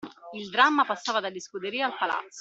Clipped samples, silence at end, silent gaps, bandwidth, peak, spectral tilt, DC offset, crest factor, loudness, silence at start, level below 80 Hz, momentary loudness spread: under 0.1%; 0 s; none; 8 kHz; -6 dBFS; -2.5 dB/octave; under 0.1%; 22 dB; -26 LUFS; 0 s; -78 dBFS; 14 LU